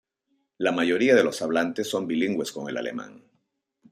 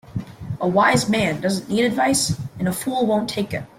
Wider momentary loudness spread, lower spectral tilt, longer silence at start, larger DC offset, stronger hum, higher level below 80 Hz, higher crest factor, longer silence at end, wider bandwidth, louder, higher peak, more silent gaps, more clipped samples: first, 13 LU vs 9 LU; about the same, -4.5 dB/octave vs -4.5 dB/octave; first, 0.6 s vs 0.05 s; neither; neither; second, -72 dBFS vs -50 dBFS; about the same, 20 dB vs 16 dB; first, 0.75 s vs 0.15 s; about the same, 15 kHz vs 16.5 kHz; second, -25 LUFS vs -20 LUFS; about the same, -6 dBFS vs -6 dBFS; neither; neither